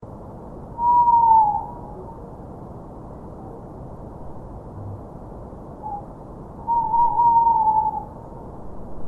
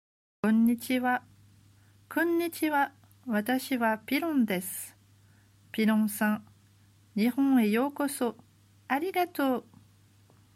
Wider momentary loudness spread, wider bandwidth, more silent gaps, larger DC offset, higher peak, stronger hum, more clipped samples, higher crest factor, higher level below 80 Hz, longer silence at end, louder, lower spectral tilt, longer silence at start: first, 23 LU vs 10 LU; second, 1.9 kHz vs 16 kHz; neither; neither; first, -6 dBFS vs -14 dBFS; neither; neither; about the same, 18 dB vs 16 dB; first, -44 dBFS vs -76 dBFS; second, 0 s vs 0.95 s; first, -18 LUFS vs -29 LUFS; first, -10 dB/octave vs -5 dB/octave; second, 0 s vs 0.45 s